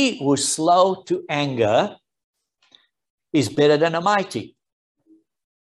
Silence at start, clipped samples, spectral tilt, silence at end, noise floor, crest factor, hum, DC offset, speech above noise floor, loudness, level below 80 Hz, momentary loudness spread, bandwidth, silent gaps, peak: 0 s; under 0.1%; -4 dB/octave; 1.25 s; -58 dBFS; 16 dB; none; under 0.1%; 39 dB; -20 LUFS; -68 dBFS; 9 LU; 12.5 kHz; 2.24-2.33 s, 3.10-3.18 s; -4 dBFS